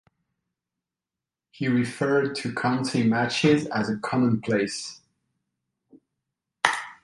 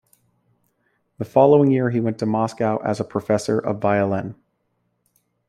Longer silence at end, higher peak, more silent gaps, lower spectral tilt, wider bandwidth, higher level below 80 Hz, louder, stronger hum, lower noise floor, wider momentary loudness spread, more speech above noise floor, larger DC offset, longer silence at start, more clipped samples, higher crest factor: second, 0.1 s vs 1.15 s; about the same, -2 dBFS vs -2 dBFS; neither; second, -5.5 dB/octave vs -7.5 dB/octave; second, 11.5 kHz vs 13.5 kHz; about the same, -64 dBFS vs -62 dBFS; second, -24 LUFS vs -20 LUFS; neither; first, -89 dBFS vs -71 dBFS; second, 7 LU vs 10 LU; first, 65 dB vs 51 dB; neither; first, 1.6 s vs 1.2 s; neither; about the same, 24 dB vs 20 dB